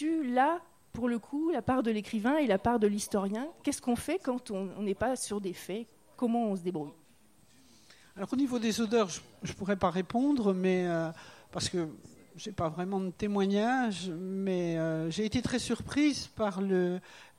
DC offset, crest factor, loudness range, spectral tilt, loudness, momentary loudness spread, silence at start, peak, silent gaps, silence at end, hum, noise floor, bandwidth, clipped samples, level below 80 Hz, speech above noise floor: under 0.1%; 18 dB; 4 LU; -5.5 dB/octave; -32 LUFS; 11 LU; 0 s; -14 dBFS; none; 0.1 s; none; -64 dBFS; 15.5 kHz; under 0.1%; -60 dBFS; 33 dB